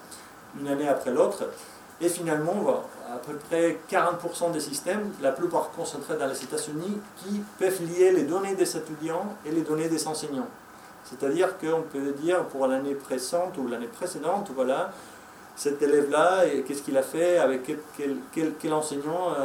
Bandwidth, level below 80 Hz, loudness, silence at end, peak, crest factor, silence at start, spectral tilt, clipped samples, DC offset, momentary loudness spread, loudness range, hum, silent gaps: 17 kHz; -72 dBFS; -27 LUFS; 0 s; -8 dBFS; 18 dB; 0 s; -4.5 dB/octave; under 0.1%; under 0.1%; 13 LU; 4 LU; none; none